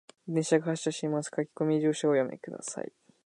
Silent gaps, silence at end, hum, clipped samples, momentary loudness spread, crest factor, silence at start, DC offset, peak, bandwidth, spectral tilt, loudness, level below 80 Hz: none; 0.4 s; none; under 0.1%; 11 LU; 18 dB; 0.25 s; under 0.1%; -12 dBFS; 11 kHz; -5.5 dB/octave; -30 LUFS; -82 dBFS